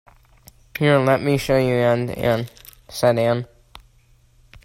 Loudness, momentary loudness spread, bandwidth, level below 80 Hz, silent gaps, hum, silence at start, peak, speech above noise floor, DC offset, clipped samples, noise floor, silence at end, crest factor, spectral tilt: -19 LUFS; 17 LU; 16 kHz; -48 dBFS; none; none; 0.75 s; -4 dBFS; 37 dB; under 0.1%; under 0.1%; -55 dBFS; 0.85 s; 18 dB; -6.5 dB/octave